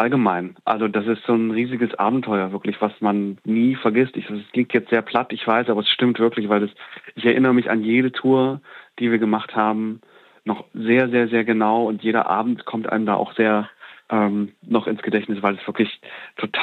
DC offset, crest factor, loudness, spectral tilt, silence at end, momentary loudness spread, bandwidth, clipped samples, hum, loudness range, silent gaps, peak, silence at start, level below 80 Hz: under 0.1%; 16 dB; -21 LUFS; -8 dB/octave; 0 s; 8 LU; 4.4 kHz; under 0.1%; none; 2 LU; none; -4 dBFS; 0 s; -76 dBFS